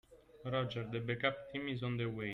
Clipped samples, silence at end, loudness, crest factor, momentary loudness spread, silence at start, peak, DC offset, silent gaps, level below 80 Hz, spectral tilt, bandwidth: under 0.1%; 0 s; -39 LUFS; 22 dB; 5 LU; 0.1 s; -18 dBFS; under 0.1%; none; -66 dBFS; -7.5 dB/octave; 6.2 kHz